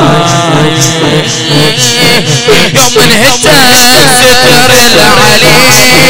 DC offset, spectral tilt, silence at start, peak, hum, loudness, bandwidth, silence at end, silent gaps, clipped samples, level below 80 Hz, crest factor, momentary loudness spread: 20%; -2.5 dB/octave; 0 s; 0 dBFS; none; -3 LUFS; over 20 kHz; 0 s; none; 10%; -30 dBFS; 6 dB; 5 LU